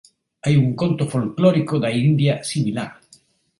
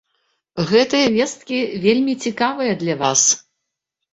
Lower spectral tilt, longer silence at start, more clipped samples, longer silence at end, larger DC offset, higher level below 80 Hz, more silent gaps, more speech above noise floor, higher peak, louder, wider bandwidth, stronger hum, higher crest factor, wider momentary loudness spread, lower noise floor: first, -7 dB/octave vs -3 dB/octave; about the same, 0.45 s vs 0.55 s; neither; about the same, 0.65 s vs 0.75 s; neither; about the same, -56 dBFS vs -60 dBFS; neither; second, 36 dB vs 62 dB; about the same, -4 dBFS vs -2 dBFS; about the same, -20 LUFS vs -18 LUFS; first, 11.5 kHz vs 8.4 kHz; neither; about the same, 16 dB vs 18 dB; about the same, 8 LU vs 8 LU; second, -55 dBFS vs -79 dBFS